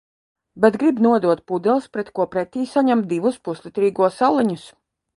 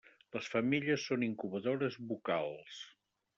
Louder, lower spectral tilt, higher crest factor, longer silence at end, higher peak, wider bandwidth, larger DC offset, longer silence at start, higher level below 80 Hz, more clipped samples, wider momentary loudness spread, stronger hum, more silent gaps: first, -20 LUFS vs -36 LUFS; first, -7 dB/octave vs -4.5 dB/octave; about the same, 18 dB vs 18 dB; about the same, 0.5 s vs 0.5 s; first, -2 dBFS vs -20 dBFS; first, 11.5 kHz vs 7.8 kHz; neither; first, 0.55 s vs 0.35 s; first, -64 dBFS vs -78 dBFS; neither; second, 8 LU vs 15 LU; neither; neither